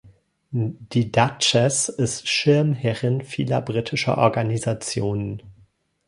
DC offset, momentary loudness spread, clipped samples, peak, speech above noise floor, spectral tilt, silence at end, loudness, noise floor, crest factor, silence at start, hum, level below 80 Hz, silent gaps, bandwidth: under 0.1%; 9 LU; under 0.1%; -2 dBFS; 36 dB; -4.5 dB/octave; 0.55 s; -22 LUFS; -58 dBFS; 20 dB; 0.05 s; none; -54 dBFS; none; 11.5 kHz